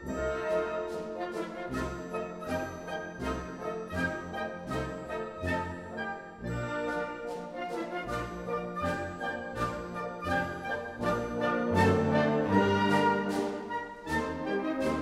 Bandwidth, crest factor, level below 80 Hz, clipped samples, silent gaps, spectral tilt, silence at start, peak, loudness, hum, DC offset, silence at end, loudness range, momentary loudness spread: 15.5 kHz; 18 dB; -52 dBFS; under 0.1%; none; -6 dB/octave; 0 s; -14 dBFS; -32 LUFS; none; under 0.1%; 0 s; 8 LU; 11 LU